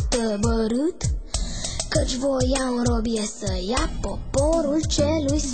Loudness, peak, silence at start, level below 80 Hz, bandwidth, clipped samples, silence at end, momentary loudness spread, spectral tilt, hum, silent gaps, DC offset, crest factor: -24 LUFS; -8 dBFS; 0 s; -30 dBFS; 9.2 kHz; under 0.1%; 0 s; 7 LU; -5 dB/octave; none; none; 0.9%; 16 dB